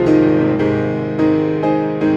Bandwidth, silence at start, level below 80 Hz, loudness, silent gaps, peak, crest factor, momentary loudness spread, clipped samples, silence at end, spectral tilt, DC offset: 7 kHz; 0 s; -44 dBFS; -16 LUFS; none; -2 dBFS; 12 dB; 5 LU; under 0.1%; 0 s; -9 dB/octave; under 0.1%